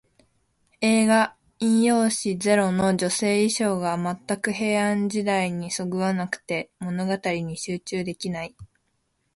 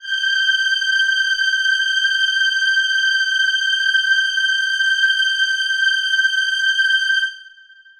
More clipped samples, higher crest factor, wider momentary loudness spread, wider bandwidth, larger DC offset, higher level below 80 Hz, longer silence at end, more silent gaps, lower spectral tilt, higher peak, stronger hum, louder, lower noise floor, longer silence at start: neither; about the same, 16 dB vs 12 dB; first, 10 LU vs 2 LU; second, 11.5 kHz vs 13.5 kHz; neither; first, -60 dBFS vs -66 dBFS; first, 0.7 s vs 0.5 s; neither; first, -4.5 dB/octave vs 7.5 dB/octave; about the same, -8 dBFS vs -6 dBFS; neither; second, -24 LUFS vs -15 LUFS; first, -72 dBFS vs -46 dBFS; first, 0.8 s vs 0 s